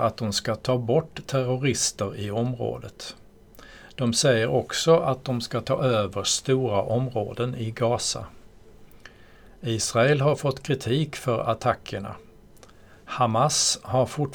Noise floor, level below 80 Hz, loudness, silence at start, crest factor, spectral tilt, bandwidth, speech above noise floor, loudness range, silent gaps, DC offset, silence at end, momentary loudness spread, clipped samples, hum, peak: -50 dBFS; -54 dBFS; -24 LUFS; 0 s; 18 dB; -4.5 dB/octave; 19.5 kHz; 26 dB; 4 LU; none; under 0.1%; 0 s; 13 LU; under 0.1%; none; -6 dBFS